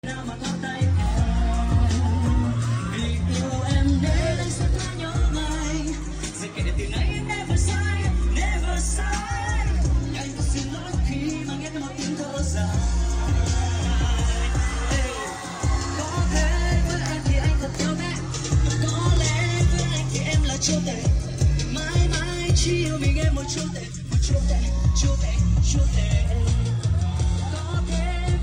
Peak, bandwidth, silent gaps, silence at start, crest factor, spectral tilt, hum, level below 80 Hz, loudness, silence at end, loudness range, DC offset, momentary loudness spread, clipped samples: -8 dBFS; 10.5 kHz; none; 0.05 s; 14 dB; -5 dB/octave; none; -26 dBFS; -24 LUFS; 0 s; 3 LU; under 0.1%; 6 LU; under 0.1%